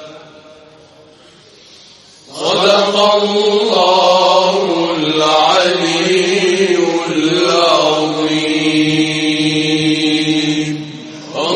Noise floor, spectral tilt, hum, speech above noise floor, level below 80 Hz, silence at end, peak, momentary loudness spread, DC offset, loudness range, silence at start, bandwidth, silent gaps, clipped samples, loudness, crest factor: -43 dBFS; -4 dB/octave; none; 32 dB; -58 dBFS; 0 s; 0 dBFS; 6 LU; under 0.1%; 3 LU; 0 s; 11 kHz; none; under 0.1%; -12 LUFS; 14 dB